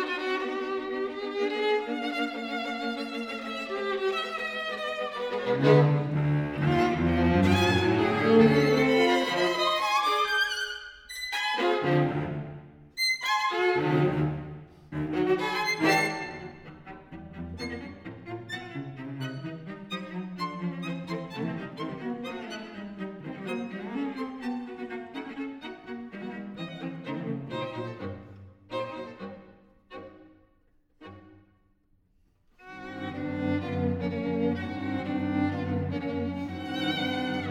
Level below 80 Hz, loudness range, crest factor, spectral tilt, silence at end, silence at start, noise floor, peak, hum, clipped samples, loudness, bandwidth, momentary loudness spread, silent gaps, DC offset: -54 dBFS; 15 LU; 20 dB; -6 dB/octave; 0 s; 0 s; -66 dBFS; -8 dBFS; none; under 0.1%; -28 LUFS; 18.5 kHz; 18 LU; none; under 0.1%